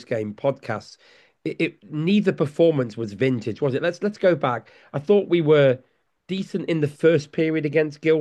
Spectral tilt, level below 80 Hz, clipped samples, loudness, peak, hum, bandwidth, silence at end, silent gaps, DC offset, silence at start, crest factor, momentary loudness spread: -7.5 dB/octave; -68 dBFS; under 0.1%; -22 LUFS; -6 dBFS; none; 9.8 kHz; 0 s; none; under 0.1%; 0 s; 16 dB; 12 LU